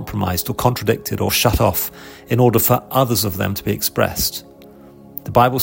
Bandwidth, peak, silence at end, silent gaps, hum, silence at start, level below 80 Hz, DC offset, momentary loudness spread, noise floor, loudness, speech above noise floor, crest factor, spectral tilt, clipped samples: 16.5 kHz; 0 dBFS; 0 s; none; none; 0 s; -38 dBFS; under 0.1%; 8 LU; -42 dBFS; -18 LUFS; 24 dB; 18 dB; -4.5 dB/octave; under 0.1%